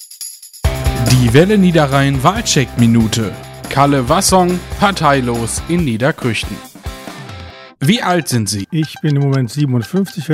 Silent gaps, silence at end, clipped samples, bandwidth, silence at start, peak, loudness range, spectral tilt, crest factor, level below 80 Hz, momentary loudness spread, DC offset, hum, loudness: none; 0 s; under 0.1%; 16.5 kHz; 0 s; 0 dBFS; 5 LU; -5 dB/octave; 14 dB; -30 dBFS; 18 LU; under 0.1%; none; -14 LUFS